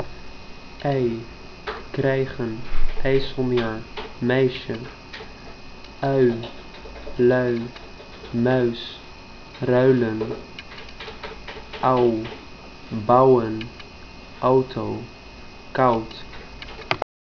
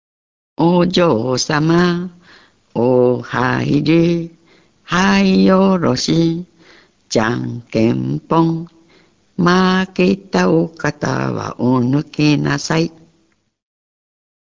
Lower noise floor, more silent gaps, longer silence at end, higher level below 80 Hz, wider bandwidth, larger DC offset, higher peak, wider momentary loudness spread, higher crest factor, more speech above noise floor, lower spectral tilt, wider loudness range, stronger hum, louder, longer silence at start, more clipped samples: second, -40 dBFS vs -60 dBFS; neither; second, 0.25 s vs 1.6 s; first, -36 dBFS vs -46 dBFS; second, 5.4 kHz vs 7.6 kHz; neither; about the same, 0 dBFS vs 0 dBFS; first, 22 LU vs 10 LU; first, 22 dB vs 16 dB; second, 20 dB vs 46 dB; first, -7.5 dB/octave vs -6 dB/octave; about the same, 4 LU vs 4 LU; neither; second, -22 LUFS vs -16 LUFS; second, 0 s vs 0.6 s; neither